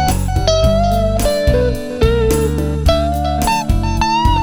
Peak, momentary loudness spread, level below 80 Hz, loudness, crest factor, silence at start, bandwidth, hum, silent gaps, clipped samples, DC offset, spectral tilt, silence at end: 0 dBFS; 3 LU; -18 dBFS; -15 LUFS; 12 dB; 0 s; 18 kHz; none; none; under 0.1%; under 0.1%; -5.5 dB/octave; 0 s